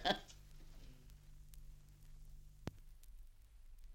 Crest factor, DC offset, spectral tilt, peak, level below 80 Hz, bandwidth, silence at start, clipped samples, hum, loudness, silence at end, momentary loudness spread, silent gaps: 30 dB; under 0.1%; -4 dB/octave; -20 dBFS; -58 dBFS; 16.5 kHz; 0 s; under 0.1%; none; -50 LUFS; 0 s; 14 LU; none